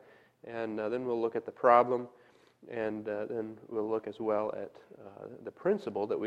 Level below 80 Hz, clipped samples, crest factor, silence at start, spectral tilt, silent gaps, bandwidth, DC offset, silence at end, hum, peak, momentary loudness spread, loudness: -78 dBFS; under 0.1%; 24 dB; 0.45 s; -8 dB/octave; none; 8.6 kHz; under 0.1%; 0 s; none; -10 dBFS; 22 LU; -32 LUFS